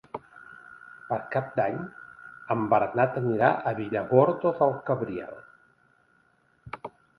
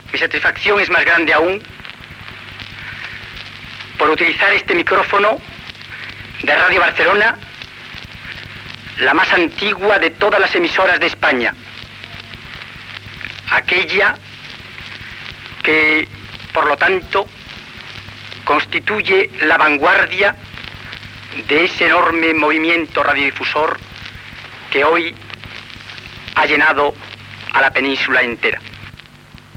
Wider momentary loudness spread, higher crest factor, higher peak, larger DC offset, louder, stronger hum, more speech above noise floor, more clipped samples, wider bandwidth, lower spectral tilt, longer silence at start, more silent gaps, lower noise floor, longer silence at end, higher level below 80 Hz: first, 24 LU vs 20 LU; first, 22 dB vs 14 dB; second, -6 dBFS vs -2 dBFS; neither; second, -26 LUFS vs -14 LUFS; neither; first, 40 dB vs 26 dB; neither; second, 5.2 kHz vs 16 kHz; first, -10 dB/octave vs -4.5 dB/octave; about the same, 0.15 s vs 0.05 s; neither; first, -66 dBFS vs -41 dBFS; second, 0.3 s vs 0.65 s; second, -66 dBFS vs -48 dBFS